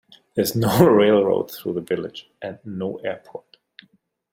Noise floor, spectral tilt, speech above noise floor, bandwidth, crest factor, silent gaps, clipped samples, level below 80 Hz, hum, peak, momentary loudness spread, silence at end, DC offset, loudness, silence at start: -60 dBFS; -6 dB/octave; 40 dB; 16.5 kHz; 20 dB; none; under 0.1%; -56 dBFS; none; -2 dBFS; 20 LU; 0.95 s; under 0.1%; -20 LUFS; 0.35 s